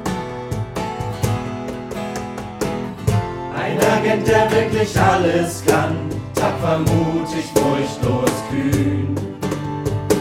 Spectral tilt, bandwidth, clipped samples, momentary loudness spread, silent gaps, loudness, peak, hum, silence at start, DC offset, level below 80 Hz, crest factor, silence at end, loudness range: -6 dB/octave; 17.5 kHz; under 0.1%; 11 LU; none; -20 LUFS; -2 dBFS; none; 0 s; under 0.1%; -40 dBFS; 18 dB; 0 s; 7 LU